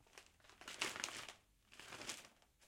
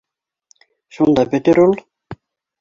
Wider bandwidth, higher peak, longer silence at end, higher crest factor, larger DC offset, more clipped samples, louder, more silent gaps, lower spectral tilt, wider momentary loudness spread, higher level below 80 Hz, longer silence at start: first, 16.5 kHz vs 7.6 kHz; second, -20 dBFS vs -2 dBFS; second, 0 s vs 0.45 s; first, 32 dB vs 16 dB; neither; neither; second, -48 LUFS vs -15 LUFS; neither; second, -0.5 dB/octave vs -7.5 dB/octave; first, 21 LU vs 6 LU; second, -78 dBFS vs -52 dBFS; second, 0 s vs 1 s